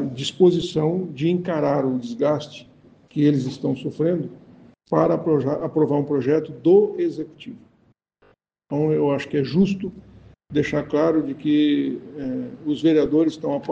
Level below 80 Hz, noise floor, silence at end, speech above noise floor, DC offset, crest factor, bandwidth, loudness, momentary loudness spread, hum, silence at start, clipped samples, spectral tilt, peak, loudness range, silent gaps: -56 dBFS; -62 dBFS; 0 s; 41 dB; under 0.1%; 18 dB; 8.2 kHz; -21 LUFS; 12 LU; none; 0 s; under 0.1%; -7.5 dB/octave; -4 dBFS; 3 LU; none